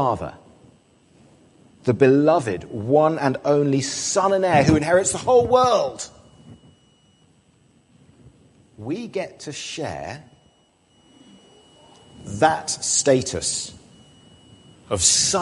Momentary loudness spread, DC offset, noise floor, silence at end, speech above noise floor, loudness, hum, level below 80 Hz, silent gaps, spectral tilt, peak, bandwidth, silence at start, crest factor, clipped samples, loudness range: 17 LU; under 0.1%; -60 dBFS; 0 s; 40 dB; -20 LUFS; none; -48 dBFS; none; -4 dB/octave; -2 dBFS; 11.5 kHz; 0 s; 20 dB; under 0.1%; 16 LU